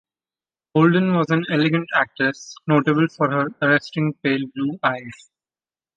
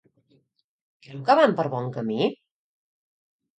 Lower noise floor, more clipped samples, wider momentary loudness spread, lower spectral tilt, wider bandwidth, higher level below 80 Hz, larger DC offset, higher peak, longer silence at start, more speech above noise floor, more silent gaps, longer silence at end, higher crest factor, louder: first, under -90 dBFS vs -66 dBFS; neither; second, 7 LU vs 11 LU; about the same, -7 dB/octave vs -7 dB/octave; second, 7.6 kHz vs 9 kHz; first, -66 dBFS vs -76 dBFS; neither; about the same, -4 dBFS vs -4 dBFS; second, 0.75 s vs 1.1 s; first, over 70 dB vs 43 dB; neither; second, 0.85 s vs 1.25 s; about the same, 18 dB vs 22 dB; first, -20 LUFS vs -23 LUFS